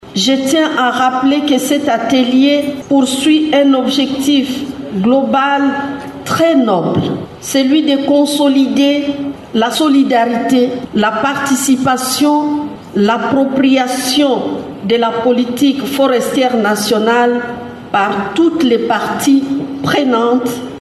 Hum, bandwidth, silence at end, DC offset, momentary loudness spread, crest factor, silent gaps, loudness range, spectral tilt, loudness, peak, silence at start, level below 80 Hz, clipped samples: none; 13.5 kHz; 0 s; under 0.1%; 7 LU; 12 dB; none; 2 LU; -4 dB/octave; -13 LUFS; 0 dBFS; 0.05 s; -52 dBFS; under 0.1%